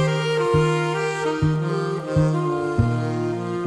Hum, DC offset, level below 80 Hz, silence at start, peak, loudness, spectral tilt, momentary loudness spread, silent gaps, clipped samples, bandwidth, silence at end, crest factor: none; under 0.1%; -42 dBFS; 0 s; -6 dBFS; -22 LUFS; -7 dB/octave; 5 LU; none; under 0.1%; 11.5 kHz; 0 s; 16 dB